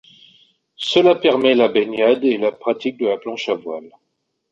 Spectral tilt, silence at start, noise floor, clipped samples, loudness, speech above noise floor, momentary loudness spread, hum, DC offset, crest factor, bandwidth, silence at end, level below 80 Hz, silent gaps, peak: -5 dB/octave; 0.8 s; -73 dBFS; under 0.1%; -17 LUFS; 55 dB; 11 LU; none; under 0.1%; 16 dB; 8 kHz; 0.65 s; -64 dBFS; none; -2 dBFS